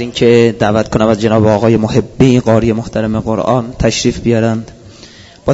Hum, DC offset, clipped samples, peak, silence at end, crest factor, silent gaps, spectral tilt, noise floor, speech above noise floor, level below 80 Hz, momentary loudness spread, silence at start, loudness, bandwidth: none; under 0.1%; 0.3%; 0 dBFS; 0 s; 12 dB; none; -6.5 dB/octave; -37 dBFS; 26 dB; -32 dBFS; 7 LU; 0 s; -12 LUFS; 8 kHz